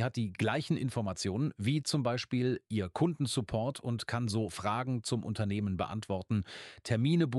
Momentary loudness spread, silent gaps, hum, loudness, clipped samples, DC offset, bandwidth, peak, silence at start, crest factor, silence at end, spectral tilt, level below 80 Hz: 4 LU; none; none; -33 LUFS; under 0.1%; under 0.1%; 12.5 kHz; -16 dBFS; 0 s; 16 dB; 0 s; -6 dB/octave; -62 dBFS